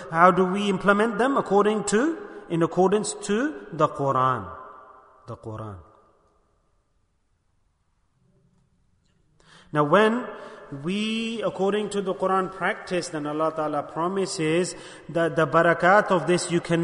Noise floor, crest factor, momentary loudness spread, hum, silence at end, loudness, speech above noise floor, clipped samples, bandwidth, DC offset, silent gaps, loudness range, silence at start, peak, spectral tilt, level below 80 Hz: -69 dBFS; 22 dB; 17 LU; none; 0 s; -23 LUFS; 45 dB; under 0.1%; 10.5 kHz; under 0.1%; none; 14 LU; 0 s; -2 dBFS; -5 dB/octave; -60 dBFS